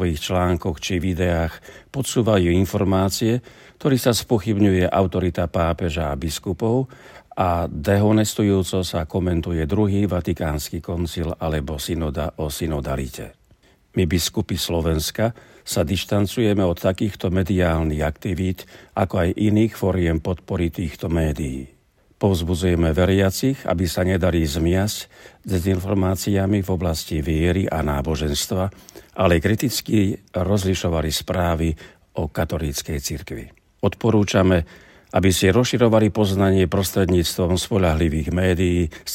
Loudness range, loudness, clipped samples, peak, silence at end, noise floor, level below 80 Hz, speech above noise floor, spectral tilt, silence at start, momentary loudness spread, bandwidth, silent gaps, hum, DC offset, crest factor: 5 LU; -21 LUFS; under 0.1%; -2 dBFS; 0 s; -56 dBFS; -38 dBFS; 35 dB; -6 dB/octave; 0 s; 9 LU; 16.5 kHz; none; none; under 0.1%; 18 dB